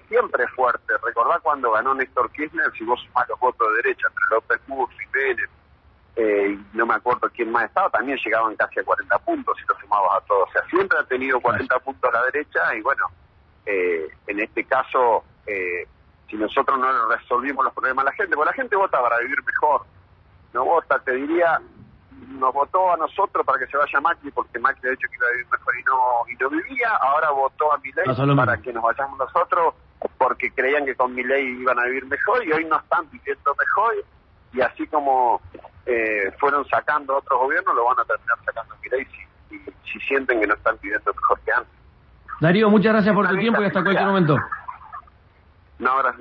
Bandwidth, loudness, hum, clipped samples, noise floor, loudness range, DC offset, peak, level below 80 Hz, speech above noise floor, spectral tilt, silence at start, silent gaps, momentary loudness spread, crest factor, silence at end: 6.2 kHz; -21 LUFS; none; under 0.1%; -54 dBFS; 3 LU; under 0.1%; -2 dBFS; -56 dBFS; 33 dB; -8.5 dB/octave; 0.1 s; none; 8 LU; 18 dB; 0.05 s